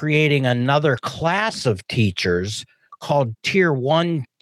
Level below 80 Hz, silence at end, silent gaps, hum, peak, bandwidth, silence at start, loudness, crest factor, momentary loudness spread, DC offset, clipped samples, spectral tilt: -58 dBFS; 0.2 s; none; none; -6 dBFS; 12.5 kHz; 0 s; -20 LUFS; 14 dB; 6 LU; under 0.1%; under 0.1%; -5.5 dB/octave